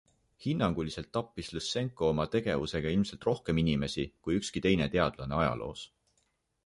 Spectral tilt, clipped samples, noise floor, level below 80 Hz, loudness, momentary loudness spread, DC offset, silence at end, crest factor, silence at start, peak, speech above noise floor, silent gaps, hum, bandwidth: -6 dB/octave; under 0.1%; -76 dBFS; -50 dBFS; -32 LUFS; 8 LU; under 0.1%; 0.8 s; 20 dB; 0.4 s; -12 dBFS; 45 dB; none; none; 11.5 kHz